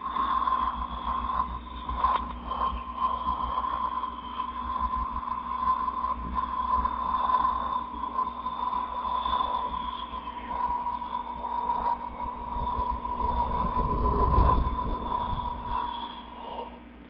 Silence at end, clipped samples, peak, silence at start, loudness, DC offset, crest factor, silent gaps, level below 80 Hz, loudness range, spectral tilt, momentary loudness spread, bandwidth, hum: 0 s; under 0.1%; -10 dBFS; 0 s; -30 LUFS; under 0.1%; 20 dB; none; -38 dBFS; 3 LU; -10 dB/octave; 9 LU; 5.4 kHz; none